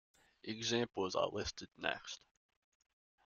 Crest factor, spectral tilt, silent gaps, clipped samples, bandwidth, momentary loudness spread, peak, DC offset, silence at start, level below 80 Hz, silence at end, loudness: 26 dB; -3.5 dB/octave; none; under 0.1%; 8.2 kHz; 13 LU; -18 dBFS; under 0.1%; 0.45 s; -68 dBFS; 1.1 s; -40 LUFS